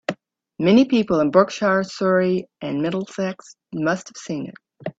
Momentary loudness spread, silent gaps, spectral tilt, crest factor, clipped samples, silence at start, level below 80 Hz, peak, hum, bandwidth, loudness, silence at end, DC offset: 16 LU; none; -6 dB/octave; 18 dB; under 0.1%; 0.1 s; -62 dBFS; -2 dBFS; none; 8 kHz; -21 LUFS; 0.1 s; under 0.1%